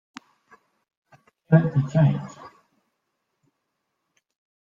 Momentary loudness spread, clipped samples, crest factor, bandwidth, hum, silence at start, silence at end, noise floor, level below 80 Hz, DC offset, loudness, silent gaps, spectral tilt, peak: 12 LU; under 0.1%; 22 dB; 7.2 kHz; none; 1.5 s; 2.2 s; -78 dBFS; -62 dBFS; under 0.1%; -21 LUFS; none; -9 dB/octave; -4 dBFS